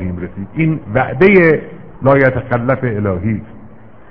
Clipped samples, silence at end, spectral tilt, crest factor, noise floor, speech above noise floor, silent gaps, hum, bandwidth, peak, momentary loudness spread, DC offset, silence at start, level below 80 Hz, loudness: 0.1%; 0.45 s; -10.5 dB/octave; 14 dB; -39 dBFS; 26 dB; none; none; 5.4 kHz; 0 dBFS; 14 LU; 1%; 0 s; -40 dBFS; -14 LUFS